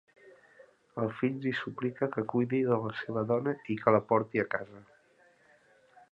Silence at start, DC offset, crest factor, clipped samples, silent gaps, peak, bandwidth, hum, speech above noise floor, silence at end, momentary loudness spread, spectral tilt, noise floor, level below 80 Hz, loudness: 0.25 s; under 0.1%; 24 dB; under 0.1%; none; -8 dBFS; 7.2 kHz; none; 34 dB; 1.3 s; 9 LU; -9 dB/octave; -64 dBFS; -72 dBFS; -31 LUFS